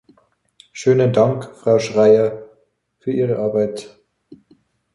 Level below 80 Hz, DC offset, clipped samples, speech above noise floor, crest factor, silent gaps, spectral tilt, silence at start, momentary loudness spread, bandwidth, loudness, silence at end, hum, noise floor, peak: -60 dBFS; under 0.1%; under 0.1%; 46 dB; 16 dB; none; -7 dB/octave; 0.75 s; 17 LU; 11 kHz; -17 LUFS; 0.6 s; none; -62 dBFS; -2 dBFS